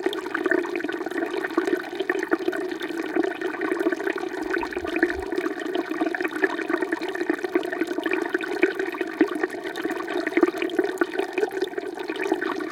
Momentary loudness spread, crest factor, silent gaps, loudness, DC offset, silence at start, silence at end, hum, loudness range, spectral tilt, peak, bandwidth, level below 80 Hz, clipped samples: 5 LU; 22 dB; none; -26 LUFS; under 0.1%; 0 s; 0 s; none; 1 LU; -4 dB/octave; -4 dBFS; 16.5 kHz; -60 dBFS; under 0.1%